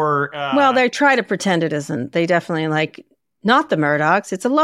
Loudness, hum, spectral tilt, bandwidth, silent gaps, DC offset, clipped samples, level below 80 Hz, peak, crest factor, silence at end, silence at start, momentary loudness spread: -18 LUFS; none; -5 dB/octave; 13 kHz; none; under 0.1%; under 0.1%; -66 dBFS; -2 dBFS; 16 dB; 0 s; 0 s; 7 LU